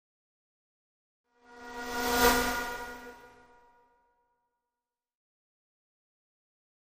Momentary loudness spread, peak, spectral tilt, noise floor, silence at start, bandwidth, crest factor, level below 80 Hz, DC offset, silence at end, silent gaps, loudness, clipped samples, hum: 23 LU; -10 dBFS; -2 dB/octave; under -90 dBFS; 1.5 s; 15.5 kHz; 28 dB; -52 dBFS; under 0.1%; 3.55 s; none; -29 LUFS; under 0.1%; none